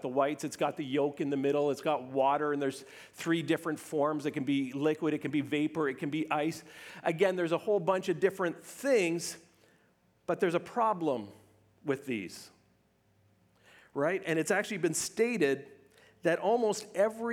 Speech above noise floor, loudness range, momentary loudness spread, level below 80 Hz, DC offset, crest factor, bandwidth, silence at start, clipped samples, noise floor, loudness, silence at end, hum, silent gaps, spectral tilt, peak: 38 dB; 4 LU; 9 LU; -80 dBFS; under 0.1%; 18 dB; 17.5 kHz; 0 s; under 0.1%; -69 dBFS; -31 LUFS; 0 s; none; none; -5 dB/octave; -14 dBFS